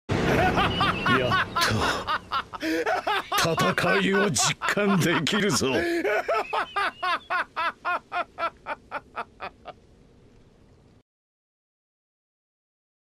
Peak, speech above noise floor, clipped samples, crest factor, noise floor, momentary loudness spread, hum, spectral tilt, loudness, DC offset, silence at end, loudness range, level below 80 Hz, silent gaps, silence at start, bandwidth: -8 dBFS; 31 dB; under 0.1%; 20 dB; -56 dBFS; 12 LU; none; -4 dB/octave; -24 LUFS; under 0.1%; 3.35 s; 14 LU; -48 dBFS; none; 0.1 s; 15.5 kHz